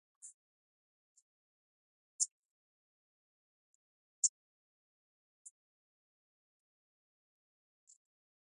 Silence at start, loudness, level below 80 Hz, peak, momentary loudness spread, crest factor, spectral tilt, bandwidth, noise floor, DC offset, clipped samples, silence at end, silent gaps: 0.25 s; -36 LUFS; under -90 dBFS; -16 dBFS; 25 LU; 34 dB; 8 dB/octave; 10.5 kHz; under -90 dBFS; under 0.1%; under 0.1%; 4.15 s; 0.34-1.15 s, 1.22-2.19 s, 2.32-4.23 s